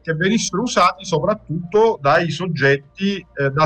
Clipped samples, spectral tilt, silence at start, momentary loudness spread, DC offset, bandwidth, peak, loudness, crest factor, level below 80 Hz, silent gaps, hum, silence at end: under 0.1%; -5 dB/octave; 0.05 s; 7 LU; under 0.1%; 9.4 kHz; -4 dBFS; -18 LUFS; 14 dB; -50 dBFS; none; none; 0 s